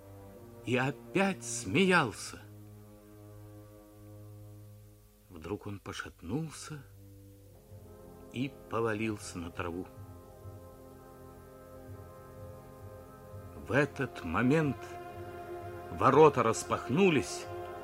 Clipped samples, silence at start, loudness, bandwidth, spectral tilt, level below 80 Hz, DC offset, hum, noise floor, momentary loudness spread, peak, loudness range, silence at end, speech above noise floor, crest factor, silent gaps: under 0.1%; 0 s; -31 LUFS; 16 kHz; -5.5 dB/octave; -60 dBFS; under 0.1%; none; -58 dBFS; 25 LU; -10 dBFS; 20 LU; 0 s; 27 dB; 24 dB; none